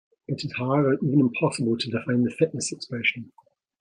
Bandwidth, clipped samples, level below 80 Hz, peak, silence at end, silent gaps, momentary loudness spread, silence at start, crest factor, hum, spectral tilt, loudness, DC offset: 10.5 kHz; under 0.1%; -66 dBFS; -8 dBFS; 0.55 s; none; 9 LU; 0.3 s; 18 dB; none; -5.5 dB/octave; -25 LUFS; under 0.1%